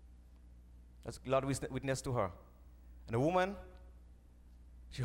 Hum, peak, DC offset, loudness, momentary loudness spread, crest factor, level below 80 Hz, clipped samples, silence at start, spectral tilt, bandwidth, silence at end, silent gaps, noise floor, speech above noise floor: 60 Hz at -55 dBFS; -20 dBFS; under 0.1%; -37 LUFS; 25 LU; 20 dB; -56 dBFS; under 0.1%; 0 s; -6 dB/octave; 16 kHz; 0 s; none; -59 dBFS; 23 dB